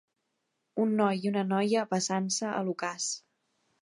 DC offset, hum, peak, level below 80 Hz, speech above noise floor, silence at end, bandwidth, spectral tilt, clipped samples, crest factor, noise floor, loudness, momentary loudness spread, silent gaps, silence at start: under 0.1%; none; -12 dBFS; -80 dBFS; 51 dB; 0.6 s; 11.5 kHz; -4.5 dB/octave; under 0.1%; 18 dB; -80 dBFS; -30 LUFS; 7 LU; none; 0.75 s